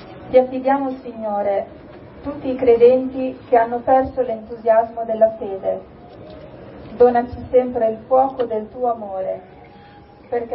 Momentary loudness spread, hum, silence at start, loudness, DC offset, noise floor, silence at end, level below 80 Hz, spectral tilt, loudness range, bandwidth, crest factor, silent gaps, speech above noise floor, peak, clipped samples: 17 LU; none; 0 s; -19 LUFS; under 0.1%; -44 dBFS; 0 s; -48 dBFS; -11 dB/octave; 3 LU; 5.2 kHz; 18 dB; none; 26 dB; -2 dBFS; under 0.1%